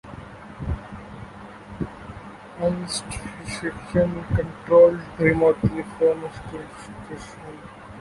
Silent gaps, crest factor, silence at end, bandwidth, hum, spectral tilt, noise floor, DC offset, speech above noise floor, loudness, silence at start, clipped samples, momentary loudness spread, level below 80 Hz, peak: none; 20 dB; 0 s; 11.5 kHz; none; -6 dB/octave; -41 dBFS; under 0.1%; 18 dB; -23 LUFS; 0.05 s; under 0.1%; 22 LU; -42 dBFS; -4 dBFS